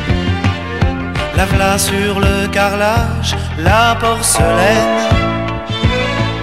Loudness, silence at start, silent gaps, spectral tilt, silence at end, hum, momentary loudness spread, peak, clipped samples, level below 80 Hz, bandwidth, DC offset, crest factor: -14 LUFS; 0 s; none; -4.5 dB/octave; 0 s; none; 6 LU; 0 dBFS; under 0.1%; -24 dBFS; 16.5 kHz; 1%; 14 dB